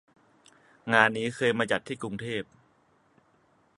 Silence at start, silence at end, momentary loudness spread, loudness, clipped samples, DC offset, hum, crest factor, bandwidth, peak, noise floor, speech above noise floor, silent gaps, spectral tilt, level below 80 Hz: 0.85 s; 1.35 s; 14 LU; -27 LUFS; under 0.1%; under 0.1%; none; 28 dB; 11.5 kHz; -4 dBFS; -66 dBFS; 38 dB; none; -4.5 dB/octave; -68 dBFS